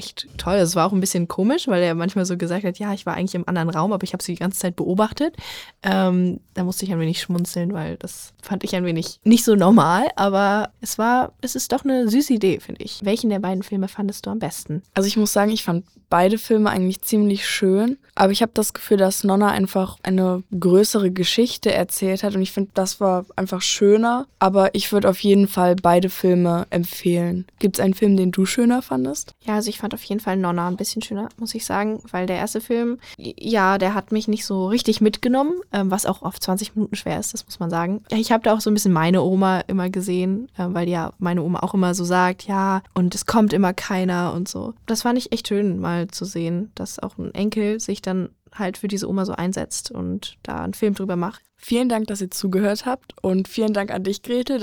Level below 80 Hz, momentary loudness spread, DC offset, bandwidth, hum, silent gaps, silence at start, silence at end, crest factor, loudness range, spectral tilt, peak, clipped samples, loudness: -52 dBFS; 10 LU; 0.1%; over 20 kHz; none; none; 0 s; 0 s; 18 dB; 6 LU; -5 dB/octave; -2 dBFS; under 0.1%; -21 LUFS